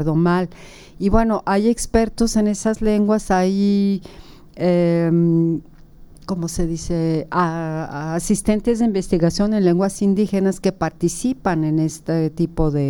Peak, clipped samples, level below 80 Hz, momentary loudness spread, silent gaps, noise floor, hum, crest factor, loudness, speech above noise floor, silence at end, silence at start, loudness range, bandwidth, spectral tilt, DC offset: -2 dBFS; under 0.1%; -34 dBFS; 7 LU; none; -42 dBFS; none; 16 dB; -19 LUFS; 24 dB; 0 s; 0 s; 3 LU; 17 kHz; -6.5 dB/octave; under 0.1%